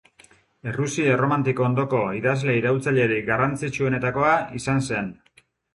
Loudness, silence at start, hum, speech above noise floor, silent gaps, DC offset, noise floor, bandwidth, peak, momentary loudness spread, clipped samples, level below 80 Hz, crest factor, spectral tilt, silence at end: -22 LUFS; 0.65 s; none; 33 dB; none; under 0.1%; -55 dBFS; 11.5 kHz; -6 dBFS; 7 LU; under 0.1%; -54 dBFS; 16 dB; -6.5 dB/octave; 0.6 s